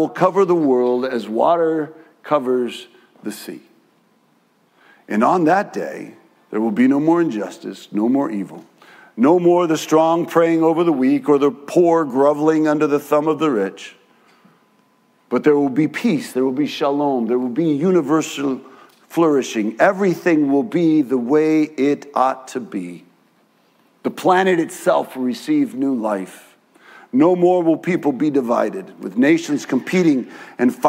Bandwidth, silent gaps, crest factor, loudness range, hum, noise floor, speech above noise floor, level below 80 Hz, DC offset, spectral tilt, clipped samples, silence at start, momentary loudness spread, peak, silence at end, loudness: 16 kHz; none; 18 dB; 6 LU; none; -59 dBFS; 42 dB; -76 dBFS; under 0.1%; -6.5 dB/octave; under 0.1%; 0 s; 13 LU; 0 dBFS; 0 s; -18 LUFS